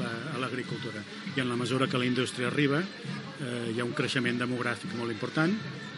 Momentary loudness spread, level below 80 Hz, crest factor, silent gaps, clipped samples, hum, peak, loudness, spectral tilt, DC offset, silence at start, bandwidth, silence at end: 9 LU; -78 dBFS; 18 dB; none; under 0.1%; none; -12 dBFS; -31 LUFS; -5.5 dB/octave; under 0.1%; 0 s; 11.5 kHz; 0 s